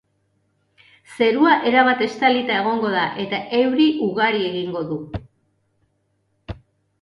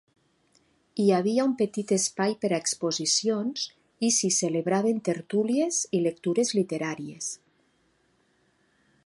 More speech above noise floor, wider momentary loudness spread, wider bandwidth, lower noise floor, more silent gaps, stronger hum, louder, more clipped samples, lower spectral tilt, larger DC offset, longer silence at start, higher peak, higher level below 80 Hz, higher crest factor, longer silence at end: first, 49 dB vs 42 dB; first, 19 LU vs 10 LU; about the same, 11.5 kHz vs 11.5 kHz; about the same, -68 dBFS vs -68 dBFS; neither; neither; first, -19 LUFS vs -26 LUFS; neither; first, -6 dB/octave vs -3.5 dB/octave; neither; first, 1.1 s vs 0.95 s; first, -2 dBFS vs -10 dBFS; first, -50 dBFS vs -76 dBFS; about the same, 18 dB vs 18 dB; second, 0.45 s vs 1.7 s